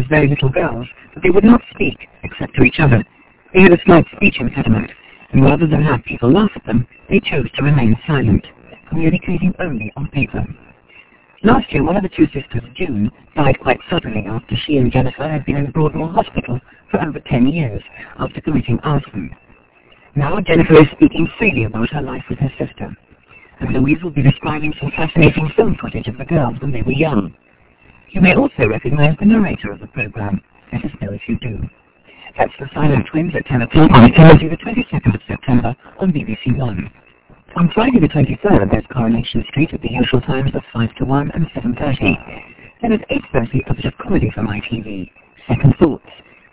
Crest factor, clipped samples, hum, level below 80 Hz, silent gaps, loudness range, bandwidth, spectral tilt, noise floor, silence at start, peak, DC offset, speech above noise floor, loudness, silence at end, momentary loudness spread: 14 dB; under 0.1%; none; -32 dBFS; none; 8 LU; 4 kHz; -11.5 dB/octave; -49 dBFS; 0 s; 0 dBFS; under 0.1%; 34 dB; -15 LUFS; 0.55 s; 14 LU